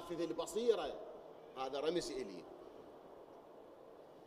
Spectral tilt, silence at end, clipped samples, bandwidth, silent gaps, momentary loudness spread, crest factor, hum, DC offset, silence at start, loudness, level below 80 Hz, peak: -4 dB/octave; 0 s; under 0.1%; 15.5 kHz; none; 21 LU; 22 dB; none; under 0.1%; 0 s; -41 LUFS; -72 dBFS; -22 dBFS